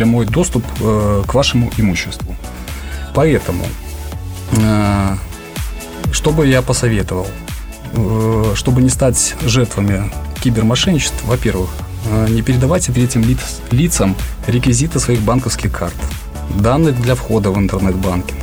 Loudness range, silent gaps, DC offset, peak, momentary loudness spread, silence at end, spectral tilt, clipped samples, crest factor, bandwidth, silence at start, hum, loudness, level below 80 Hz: 3 LU; none; 0.3%; -2 dBFS; 12 LU; 0 s; -5.5 dB/octave; under 0.1%; 14 dB; over 20 kHz; 0 s; none; -15 LUFS; -26 dBFS